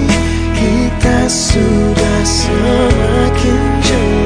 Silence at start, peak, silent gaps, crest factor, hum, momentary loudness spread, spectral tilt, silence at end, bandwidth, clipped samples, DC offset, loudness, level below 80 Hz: 0 s; 0 dBFS; none; 10 dB; none; 2 LU; -5 dB/octave; 0 s; 13.5 kHz; under 0.1%; under 0.1%; -12 LUFS; -18 dBFS